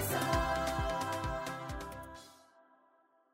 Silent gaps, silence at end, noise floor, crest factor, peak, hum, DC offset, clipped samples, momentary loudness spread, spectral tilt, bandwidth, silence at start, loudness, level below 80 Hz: none; 1 s; -70 dBFS; 18 dB; -20 dBFS; none; under 0.1%; under 0.1%; 18 LU; -4.5 dB/octave; 16 kHz; 0 s; -36 LUFS; -48 dBFS